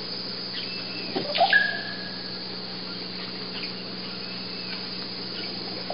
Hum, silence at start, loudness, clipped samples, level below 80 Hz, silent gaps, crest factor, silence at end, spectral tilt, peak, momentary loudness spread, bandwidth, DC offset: none; 0 s; -28 LUFS; under 0.1%; -70 dBFS; none; 22 dB; 0 s; -8 dB/octave; -8 dBFS; 12 LU; 5.6 kHz; 0.5%